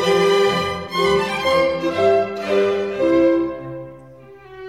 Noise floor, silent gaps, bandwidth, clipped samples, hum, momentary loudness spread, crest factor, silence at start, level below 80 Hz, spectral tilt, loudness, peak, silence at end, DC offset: -42 dBFS; none; 15 kHz; under 0.1%; none; 12 LU; 14 dB; 0 s; -50 dBFS; -5 dB/octave; -18 LUFS; -6 dBFS; 0 s; 0.1%